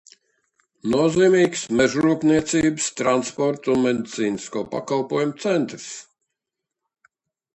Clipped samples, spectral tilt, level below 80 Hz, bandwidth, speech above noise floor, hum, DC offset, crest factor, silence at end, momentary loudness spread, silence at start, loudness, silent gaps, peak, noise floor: under 0.1%; -5 dB/octave; -56 dBFS; 11 kHz; 64 dB; none; under 0.1%; 18 dB; 1.55 s; 11 LU; 0.85 s; -21 LUFS; none; -4 dBFS; -84 dBFS